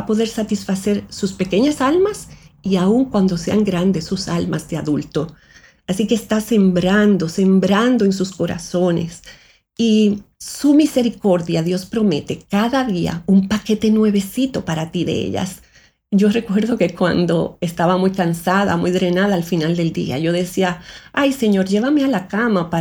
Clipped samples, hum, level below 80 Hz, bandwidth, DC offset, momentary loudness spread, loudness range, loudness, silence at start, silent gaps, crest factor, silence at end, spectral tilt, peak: under 0.1%; none; -48 dBFS; 17.5 kHz; under 0.1%; 8 LU; 3 LU; -18 LUFS; 0 s; none; 16 dB; 0 s; -6 dB/octave; -2 dBFS